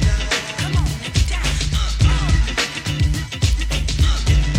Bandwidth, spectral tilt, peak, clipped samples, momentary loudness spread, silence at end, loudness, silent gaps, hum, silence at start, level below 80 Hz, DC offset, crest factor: 15.5 kHz; -4 dB/octave; -4 dBFS; under 0.1%; 3 LU; 0 s; -20 LUFS; none; none; 0 s; -20 dBFS; under 0.1%; 14 dB